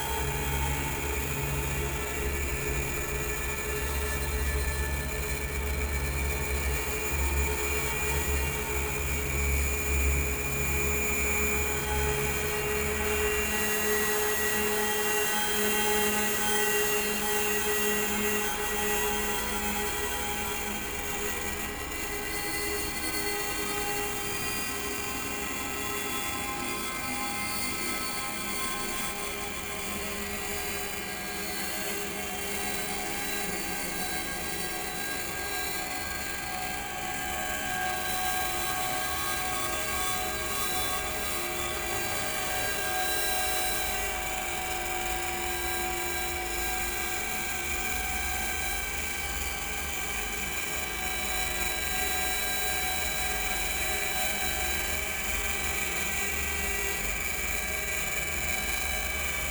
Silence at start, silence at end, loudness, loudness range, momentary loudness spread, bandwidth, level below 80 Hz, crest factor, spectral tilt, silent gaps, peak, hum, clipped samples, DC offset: 0 s; 0 s; -28 LUFS; 5 LU; 6 LU; over 20 kHz; -40 dBFS; 18 dB; -2.5 dB/octave; none; -12 dBFS; none; under 0.1%; under 0.1%